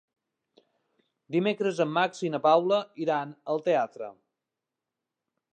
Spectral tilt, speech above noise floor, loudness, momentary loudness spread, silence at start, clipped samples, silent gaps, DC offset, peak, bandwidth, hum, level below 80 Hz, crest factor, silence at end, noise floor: -6 dB/octave; 61 dB; -27 LUFS; 9 LU; 1.3 s; under 0.1%; none; under 0.1%; -8 dBFS; 9.2 kHz; none; -86 dBFS; 20 dB; 1.4 s; -88 dBFS